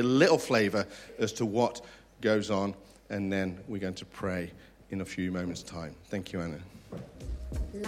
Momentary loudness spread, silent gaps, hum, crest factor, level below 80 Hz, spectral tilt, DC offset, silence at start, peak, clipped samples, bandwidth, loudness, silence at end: 17 LU; none; none; 22 dB; -48 dBFS; -5.5 dB/octave; under 0.1%; 0 s; -10 dBFS; under 0.1%; 15.5 kHz; -31 LUFS; 0 s